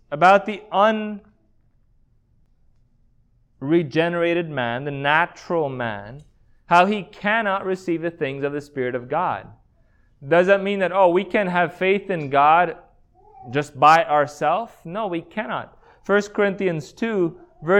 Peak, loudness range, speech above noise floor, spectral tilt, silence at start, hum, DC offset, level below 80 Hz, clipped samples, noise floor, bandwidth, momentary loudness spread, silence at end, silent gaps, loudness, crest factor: -2 dBFS; 6 LU; 39 dB; -6 dB/octave; 0.1 s; none; under 0.1%; -58 dBFS; under 0.1%; -59 dBFS; 12 kHz; 12 LU; 0 s; none; -21 LUFS; 20 dB